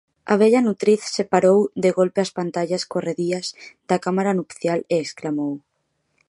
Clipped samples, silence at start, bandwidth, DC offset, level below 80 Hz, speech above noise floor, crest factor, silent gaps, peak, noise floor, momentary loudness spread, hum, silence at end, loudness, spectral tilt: under 0.1%; 0.25 s; 11.5 kHz; under 0.1%; -68 dBFS; 51 dB; 18 dB; none; -2 dBFS; -72 dBFS; 10 LU; none; 0.7 s; -21 LUFS; -5.5 dB/octave